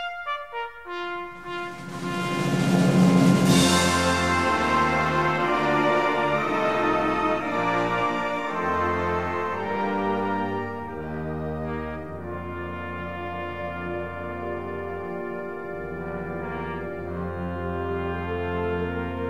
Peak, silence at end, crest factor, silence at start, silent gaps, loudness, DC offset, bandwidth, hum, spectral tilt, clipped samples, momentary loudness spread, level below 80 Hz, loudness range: -6 dBFS; 0 s; 18 dB; 0 s; none; -25 LUFS; 0.5%; 15 kHz; none; -5 dB/octave; under 0.1%; 14 LU; -48 dBFS; 12 LU